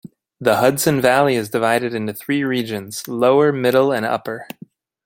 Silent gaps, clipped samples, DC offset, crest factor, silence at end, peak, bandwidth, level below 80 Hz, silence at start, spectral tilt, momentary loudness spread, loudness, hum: none; under 0.1%; under 0.1%; 16 dB; 0.6 s; -2 dBFS; 17 kHz; -60 dBFS; 0.4 s; -5 dB/octave; 12 LU; -18 LUFS; none